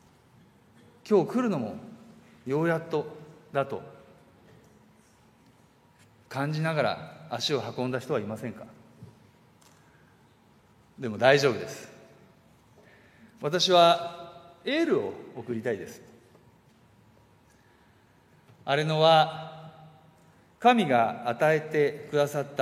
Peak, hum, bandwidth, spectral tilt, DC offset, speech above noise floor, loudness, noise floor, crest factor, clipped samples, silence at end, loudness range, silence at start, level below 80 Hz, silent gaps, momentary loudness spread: -4 dBFS; none; 15.5 kHz; -5 dB/octave; under 0.1%; 34 dB; -26 LUFS; -60 dBFS; 24 dB; under 0.1%; 0 s; 12 LU; 1.05 s; -74 dBFS; none; 21 LU